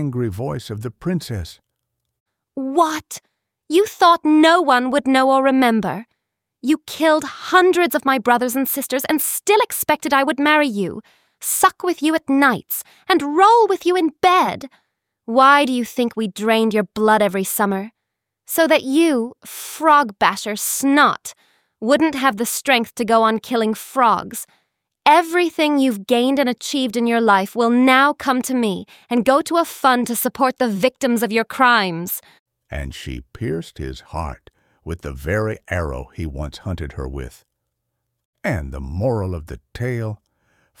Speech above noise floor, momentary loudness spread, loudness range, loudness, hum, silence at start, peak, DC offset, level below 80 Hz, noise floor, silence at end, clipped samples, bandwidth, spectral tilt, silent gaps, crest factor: 61 dB; 16 LU; 11 LU; -17 LUFS; none; 0 s; -2 dBFS; under 0.1%; -42 dBFS; -79 dBFS; 0.65 s; under 0.1%; 18 kHz; -4 dB/octave; 2.20-2.26 s, 32.39-32.46 s, 38.25-38.33 s; 18 dB